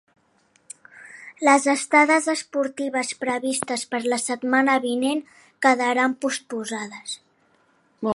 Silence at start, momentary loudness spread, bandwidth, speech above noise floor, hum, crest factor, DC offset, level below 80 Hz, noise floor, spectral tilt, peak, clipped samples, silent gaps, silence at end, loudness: 0.95 s; 18 LU; 11.5 kHz; 41 dB; none; 20 dB; under 0.1%; -72 dBFS; -63 dBFS; -2.5 dB/octave; -4 dBFS; under 0.1%; none; 0.05 s; -22 LUFS